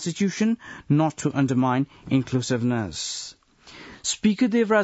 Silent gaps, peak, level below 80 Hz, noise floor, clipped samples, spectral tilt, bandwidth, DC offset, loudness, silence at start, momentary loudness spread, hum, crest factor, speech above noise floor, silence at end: none; -8 dBFS; -58 dBFS; -47 dBFS; under 0.1%; -5.5 dB/octave; 8 kHz; under 0.1%; -24 LUFS; 0 s; 9 LU; none; 16 dB; 24 dB; 0 s